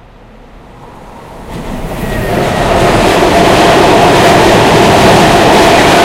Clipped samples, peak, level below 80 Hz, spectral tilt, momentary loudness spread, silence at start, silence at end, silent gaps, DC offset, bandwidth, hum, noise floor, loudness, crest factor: 2%; 0 dBFS; -24 dBFS; -4.5 dB/octave; 14 LU; 0.8 s; 0 s; none; under 0.1%; 17.5 kHz; none; -35 dBFS; -6 LUFS; 8 dB